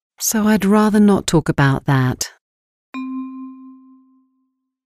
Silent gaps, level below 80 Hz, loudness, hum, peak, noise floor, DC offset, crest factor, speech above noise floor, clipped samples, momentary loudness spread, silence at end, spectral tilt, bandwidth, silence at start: 2.41-2.93 s; -44 dBFS; -16 LUFS; none; -2 dBFS; -69 dBFS; under 0.1%; 16 dB; 55 dB; under 0.1%; 18 LU; 1.15 s; -5.5 dB/octave; 15.5 kHz; 0.2 s